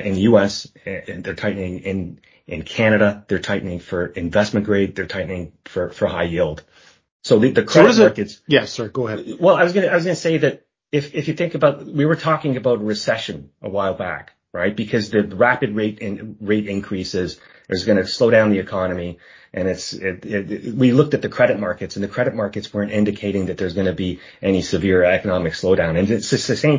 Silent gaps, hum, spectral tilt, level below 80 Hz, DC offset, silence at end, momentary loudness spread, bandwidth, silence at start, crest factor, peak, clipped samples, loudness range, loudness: 7.12-7.20 s; none; -6 dB/octave; -44 dBFS; under 0.1%; 0 s; 13 LU; 7.6 kHz; 0 s; 18 dB; 0 dBFS; under 0.1%; 5 LU; -19 LUFS